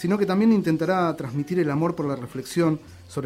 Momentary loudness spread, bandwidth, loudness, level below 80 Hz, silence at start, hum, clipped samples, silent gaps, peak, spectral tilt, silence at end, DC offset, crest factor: 10 LU; 15.5 kHz; -23 LUFS; -58 dBFS; 0 s; none; under 0.1%; none; -8 dBFS; -7 dB/octave; 0 s; under 0.1%; 14 dB